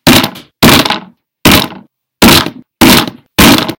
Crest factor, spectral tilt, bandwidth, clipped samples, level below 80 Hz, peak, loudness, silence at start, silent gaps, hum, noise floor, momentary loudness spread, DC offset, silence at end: 8 dB; -3.5 dB/octave; over 20 kHz; 6%; -28 dBFS; 0 dBFS; -7 LUFS; 0.05 s; none; none; -35 dBFS; 12 LU; under 0.1%; 0.05 s